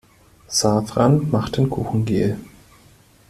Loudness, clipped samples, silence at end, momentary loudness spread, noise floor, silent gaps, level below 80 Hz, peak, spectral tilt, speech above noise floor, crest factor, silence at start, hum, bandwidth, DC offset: -20 LUFS; under 0.1%; 0.8 s; 6 LU; -51 dBFS; none; -46 dBFS; -4 dBFS; -5.5 dB/octave; 33 dB; 18 dB; 0.5 s; none; 14 kHz; under 0.1%